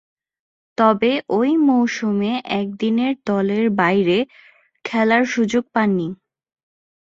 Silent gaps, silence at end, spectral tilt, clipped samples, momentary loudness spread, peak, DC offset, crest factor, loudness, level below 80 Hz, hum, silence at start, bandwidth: none; 0.95 s; -6 dB/octave; under 0.1%; 8 LU; -2 dBFS; under 0.1%; 18 dB; -18 LUFS; -62 dBFS; none; 0.8 s; 7.6 kHz